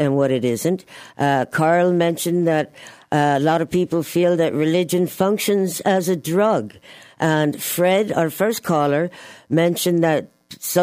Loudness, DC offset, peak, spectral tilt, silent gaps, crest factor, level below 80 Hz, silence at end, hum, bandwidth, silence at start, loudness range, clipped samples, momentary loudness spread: -19 LUFS; under 0.1%; -4 dBFS; -5.5 dB/octave; none; 14 dB; -62 dBFS; 0 s; none; 16 kHz; 0 s; 1 LU; under 0.1%; 6 LU